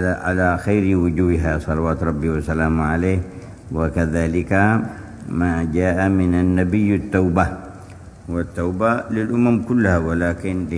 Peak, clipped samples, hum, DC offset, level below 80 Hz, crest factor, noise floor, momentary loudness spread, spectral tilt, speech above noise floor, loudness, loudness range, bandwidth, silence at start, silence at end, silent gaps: 0 dBFS; under 0.1%; none; under 0.1%; -34 dBFS; 18 dB; -38 dBFS; 10 LU; -8.5 dB/octave; 20 dB; -19 LUFS; 2 LU; 11 kHz; 0 s; 0 s; none